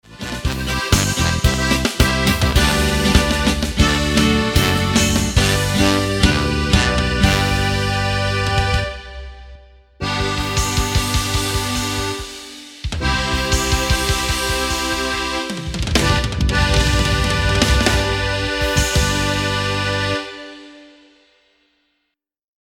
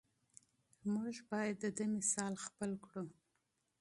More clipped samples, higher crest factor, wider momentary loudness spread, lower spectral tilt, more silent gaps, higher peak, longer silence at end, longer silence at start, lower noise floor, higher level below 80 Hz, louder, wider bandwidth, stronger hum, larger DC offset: neither; about the same, 18 dB vs 22 dB; about the same, 9 LU vs 11 LU; about the same, -4 dB/octave vs -4 dB/octave; neither; first, 0 dBFS vs -22 dBFS; first, 1.85 s vs 0.7 s; second, 0.1 s vs 0.85 s; second, -75 dBFS vs -84 dBFS; first, -24 dBFS vs -80 dBFS; first, -17 LUFS vs -41 LUFS; first, 17.5 kHz vs 11.5 kHz; neither; neither